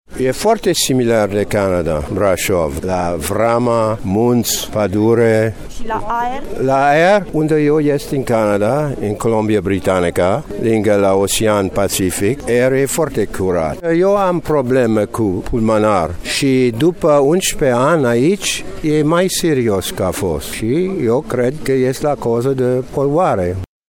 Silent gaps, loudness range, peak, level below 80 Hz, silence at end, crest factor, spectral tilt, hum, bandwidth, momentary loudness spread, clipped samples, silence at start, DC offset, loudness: none; 2 LU; 0 dBFS; -36 dBFS; 0.25 s; 14 dB; -5 dB/octave; none; 18 kHz; 6 LU; under 0.1%; 0.1 s; under 0.1%; -15 LUFS